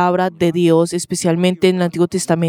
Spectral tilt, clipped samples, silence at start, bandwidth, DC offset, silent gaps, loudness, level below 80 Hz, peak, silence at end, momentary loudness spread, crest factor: -5.5 dB/octave; under 0.1%; 0 s; 16 kHz; under 0.1%; none; -16 LUFS; -56 dBFS; 0 dBFS; 0 s; 4 LU; 14 dB